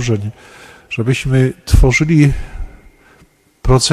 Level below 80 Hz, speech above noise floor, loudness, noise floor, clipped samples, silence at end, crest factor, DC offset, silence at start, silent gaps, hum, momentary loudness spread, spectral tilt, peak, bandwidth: -22 dBFS; 37 dB; -14 LUFS; -50 dBFS; under 0.1%; 0 s; 14 dB; under 0.1%; 0 s; none; none; 18 LU; -5.5 dB/octave; 0 dBFS; 15 kHz